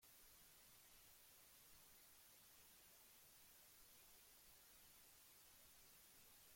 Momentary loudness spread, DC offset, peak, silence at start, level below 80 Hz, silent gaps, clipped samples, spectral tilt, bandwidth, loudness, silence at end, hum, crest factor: 0 LU; under 0.1%; -56 dBFS; 0 s; -84 dBFS; none; under 0.1%; -0.5 dB/octave; 16.5 kHz; -66 LUFS; 0 s; none; 14 dB